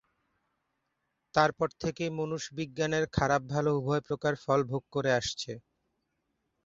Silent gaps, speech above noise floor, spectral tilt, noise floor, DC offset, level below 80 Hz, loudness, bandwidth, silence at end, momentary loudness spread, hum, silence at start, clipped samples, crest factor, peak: none; 51 dB; -5 dB/octave; -81 dBFS; under 0.1%; -58 dBFS; -30 LUFS; 8 kHz; 1.05 s; 8 LU; none; 1.35 s; under 0.1%; 24 dB; -8 dBFS